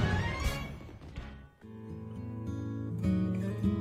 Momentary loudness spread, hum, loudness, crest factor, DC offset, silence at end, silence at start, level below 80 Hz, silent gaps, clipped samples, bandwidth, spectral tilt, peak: 17 LU; none; -35 LUFS; 18 dB; under 0.1%; 0 s; 0 s; -44 dBFS; none; under 0.1%; 15 kHz; -7 dB/octave; -16 dBFS